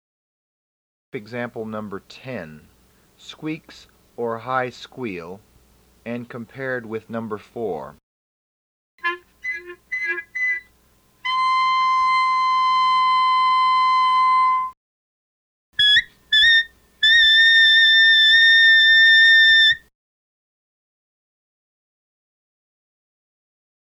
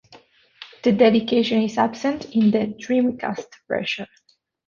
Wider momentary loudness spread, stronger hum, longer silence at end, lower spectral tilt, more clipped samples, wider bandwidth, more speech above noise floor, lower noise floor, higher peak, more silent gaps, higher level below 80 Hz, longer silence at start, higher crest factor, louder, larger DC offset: first, 22 LU vs 12 LU; neither; first, 4.1 s vs 0.6 s; second, -2 dB/octave vs -6 dB/octave; neither; first, 14 kHz vs 7.2 kHz; about the same, 29 dB vs 31 dB; first, -58 dBFS vs -51 dBFS; about the same, -6 dBFS vs -4 dBFS; first, 8.03-8.98 s, 14.77-15.73 s vs none; about the same, -58 dBFS vs -62 dBFS; first, 1.15 s vs 0.6 s; about the same, 14 dB vs 18 dB; first, -14 LUFS vs -21 LUFS; neither